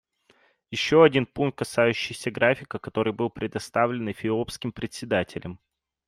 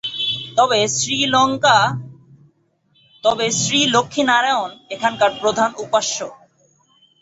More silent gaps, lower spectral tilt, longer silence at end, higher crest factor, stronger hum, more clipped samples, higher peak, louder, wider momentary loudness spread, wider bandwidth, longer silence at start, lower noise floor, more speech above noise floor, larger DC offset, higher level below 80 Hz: neither; first, -5.5 dB/octave vs -2.5 dB/octave; second, 0.5 s vs 0.85 s; about the same, 20 dB vs 18 dB; neither; neither; second, -6 dBFS vs 0 dBFS; second, -25 LUFS vs -17 LUFS; first, 14 LU vs 8 LU; first, 14 kHz vs 8.2 kHz; first, 0.7 s vs 0.05 s; about the same, -63 dBFS vs -61 dBFS; second, 38 dB vs 44 dB; neither; about the same, -58 dBFS vs -58 dBFS